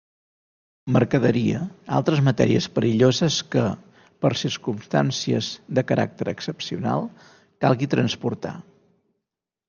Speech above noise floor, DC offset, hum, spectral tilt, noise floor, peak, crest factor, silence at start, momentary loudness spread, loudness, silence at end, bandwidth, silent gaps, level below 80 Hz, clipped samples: 63 dB; under 0.1%; none; -6 dB/octave; -85 dBFS; -4 dBFS; 20 dB; 0.85 s; 11 LU; -23 LUFS; 1.1 s; 7.2 kHz; none; -58 dBFS; under 0.1%